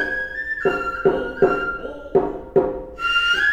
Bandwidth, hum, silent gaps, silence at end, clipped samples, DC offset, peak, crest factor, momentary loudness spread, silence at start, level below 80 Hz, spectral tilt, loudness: 9.4 kHz; none; none; 0 s; under 0.1%; under 0.1%; -2 dBFS; 18 dB; 7 LU; 0 s; -44 dBFS; -5 dB/octave; -21 LUFS